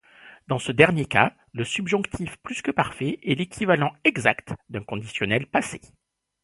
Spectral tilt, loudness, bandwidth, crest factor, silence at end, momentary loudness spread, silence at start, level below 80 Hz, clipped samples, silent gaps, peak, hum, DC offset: -5 dB/octave; -24 LUFS; 11.5 kHz; 24 dB; 0.65 s; 14 LU; 0.25 s; -54 dBFS; under 0.1%; none; 0 dBFS; none; under 0.1%